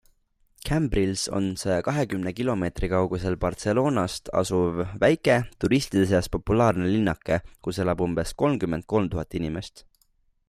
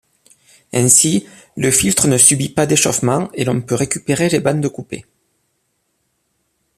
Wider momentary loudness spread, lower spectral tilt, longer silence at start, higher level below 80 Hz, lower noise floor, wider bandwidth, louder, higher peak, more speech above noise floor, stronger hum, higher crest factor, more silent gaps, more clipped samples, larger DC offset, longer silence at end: second, 6 LU vs 13 LU; first, -6 dB/octave vs -3.5 dB/octave; about the same, 0.65 s vs 0.75 s; first, -42 dBFS vs -48 dBFS; about the same, -66 dBFS vs -67 dBFS; about the same, 15 kHz vs 15 kHz; second, -25 LUFS vs -14 LUFS; second, -8 dBFS vs 0 dBFS; second, 42 dB vs 52 dB; neither; about the same, 18 dB vs 18 dB; neither; neither; neither; second, 0.7 s vs 1.75 s